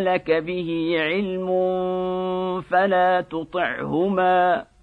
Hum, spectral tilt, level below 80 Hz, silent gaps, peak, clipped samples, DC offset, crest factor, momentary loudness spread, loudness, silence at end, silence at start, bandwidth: none; -8 dB/octave; -56 dBFS; none; -8 dBFS; under 0.1%; under 0.1%; 14 dB; 7 LU; -22 LUFS; 0.2 s; 0 s; 4.9 kHz